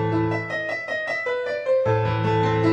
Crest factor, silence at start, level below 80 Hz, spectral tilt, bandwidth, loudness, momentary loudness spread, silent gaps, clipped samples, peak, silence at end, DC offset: 14 dB; 0 s; -50 dBFS; -7.5 dB/octave; 8 kHz; -23 LUFS; 5 LU; none; under 0.1%; -8 dBFS; 0 s; under 0.1%